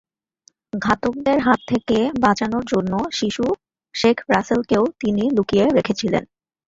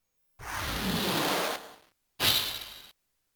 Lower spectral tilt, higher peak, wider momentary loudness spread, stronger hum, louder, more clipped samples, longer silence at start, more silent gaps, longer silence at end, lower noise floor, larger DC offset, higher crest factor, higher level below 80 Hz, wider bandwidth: first, -5.5 dB/octave vs -2.5 dB/octave; first, -2 dBFS vs -12 dBFS; second, 6 LU vs 20 LU; neither; first, -20 LUFS vs -29 LUFS; neither; first, 0.75 s vs 0.4 s; neither; about the same, 0.45 s vs 0.45 s; about the same, -59 dBFS vs -62 dBFS; neither; about the same, 18 dB vs 20 dB; about the same, -50 dBFS vs -50 dBFS; second, 7.8 kHz vs over 20 kHz